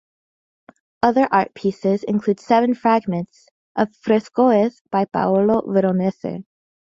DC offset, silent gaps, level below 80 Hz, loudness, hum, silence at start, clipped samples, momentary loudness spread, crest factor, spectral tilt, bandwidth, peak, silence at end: under 0.1%; 3.51-3.75 s, 4.81-4.85 s; -60 dBFS; -19 LUFS; none; 1.05 s; under 0.1%; 10 LU; 18 dB; -8 dB/octave; 7.6 kHz; -2 dBFS; 0.45 s